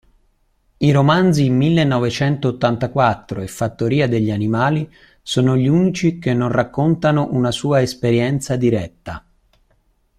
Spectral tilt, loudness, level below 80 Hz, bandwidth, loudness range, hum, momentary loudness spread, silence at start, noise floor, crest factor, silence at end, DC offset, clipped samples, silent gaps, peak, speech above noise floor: -6.5 dB/octave; -17 LUFS; -48 dBFS; 13 kHz; 2 LU; none; 9 LU; 0.8 s; -61 dBFS; 16 dB; 1 s; under 0.1%; under 0.1%; none; -2 dBFS; 44 dB